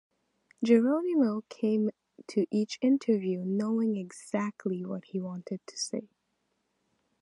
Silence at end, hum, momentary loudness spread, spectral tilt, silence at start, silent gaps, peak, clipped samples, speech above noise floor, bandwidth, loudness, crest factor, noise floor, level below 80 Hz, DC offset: 1.15 s; none; 11 LU; -6 dB/octave; 0.6 s; none; -12 dBFS; under 0.1%; 49 dB; 11.5 kHz; -30 LUFS; 18 dB; -78 dBFS; -82 dBFS; under 0.1%